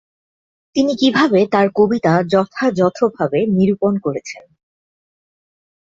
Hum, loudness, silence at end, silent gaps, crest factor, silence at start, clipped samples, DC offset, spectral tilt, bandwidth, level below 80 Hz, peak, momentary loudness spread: none; -16 LUFS; 1.55 s; none; 16 dB; 0.75 s; under 0.1%; under 0.1%; -6.5 dB/octave; 7.8 kHz; -56 dBFS; -2 dBFS; 10 LU